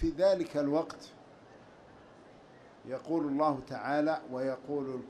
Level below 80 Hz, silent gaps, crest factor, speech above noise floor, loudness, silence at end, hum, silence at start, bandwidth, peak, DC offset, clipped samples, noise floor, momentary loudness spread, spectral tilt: -54 dBFS; none; 18 dB; 24 dB; -33 LUFS; 0 s; none; 0 s; 11 kHz; -16 dBFS; under 0.1%; under 0.1%; -56 dBFS; 14 LU; -7 dB/octave